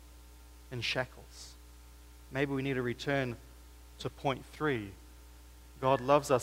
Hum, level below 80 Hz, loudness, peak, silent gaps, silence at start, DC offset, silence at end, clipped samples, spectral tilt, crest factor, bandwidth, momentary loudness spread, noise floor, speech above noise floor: none; -54 dBFS; -34 LUFS; -12 dBFS; none; 0 s; under 0.1%; 0 s; under 0.1%; -5.5 dB/octave; 22 dB; 16 kHz; 25 LU; -54 dBFS; 21 dB